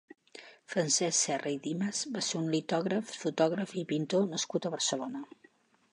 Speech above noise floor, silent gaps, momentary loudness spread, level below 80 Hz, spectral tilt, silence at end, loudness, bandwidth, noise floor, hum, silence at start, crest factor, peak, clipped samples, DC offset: 33 dB; none; 15 LU; -82 dBFS; -3.5 dB/octave; 0.7 s; -32 LUFS; 11.5 kHz; -65 dBFS; none; 0.35 s; 20 dB; -14 dBFS; under 0.1%; under 0.1%